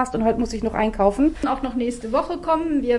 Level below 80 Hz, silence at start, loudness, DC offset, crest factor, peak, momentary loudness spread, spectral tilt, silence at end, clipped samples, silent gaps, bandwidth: -38 dBFS; 0 s; -22 LUFS; under 0.1%; 16 dB; -4 dBFS; 5 LU; -6 dB/octave; 0 s; under 0.1%; none; 11.5 kHz